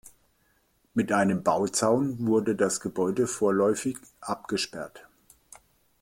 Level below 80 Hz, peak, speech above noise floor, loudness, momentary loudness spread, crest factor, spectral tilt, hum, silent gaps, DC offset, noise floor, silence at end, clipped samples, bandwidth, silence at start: -64 dBFS; -8 dBFS; 42 dB; -26 LUFS; 11 LU; 20 dB; -4.5 dB/octave; none; none; under 0.1%; -68 dBFS; 1 s; under 0.1%; 16.5 kHz; 0.95 s